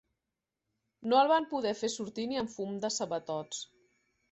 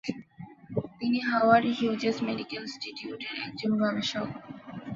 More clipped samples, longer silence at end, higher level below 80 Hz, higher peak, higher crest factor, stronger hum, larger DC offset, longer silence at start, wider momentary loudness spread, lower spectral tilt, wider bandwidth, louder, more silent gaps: neither; first, 0.7 s vs 0 s; second, -74 dBFS vs -66 dBFS; second, -12 dBFS vs -8 dBFS; about the same, 20 dB vs 22 dB; neither; neither; first, 1 s vs 0.05 s; second, 15 LU vs 20 LU; second, -3.5 dB/octave vs -5.5 dB/octave; first, 8.4 kHz vs 7.6 kHz; second, -32 LUFS vs -29 LUFS; neither